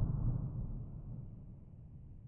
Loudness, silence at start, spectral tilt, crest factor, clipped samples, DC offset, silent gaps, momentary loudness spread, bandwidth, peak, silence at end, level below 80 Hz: -42 LUFS; 0 s; -13.5 dB/octave; 18 dB; under 0.1%; under 0.1%; none; 17 LU; 1.7 kHz; -22 dBFS; 0 s; -46 dBFS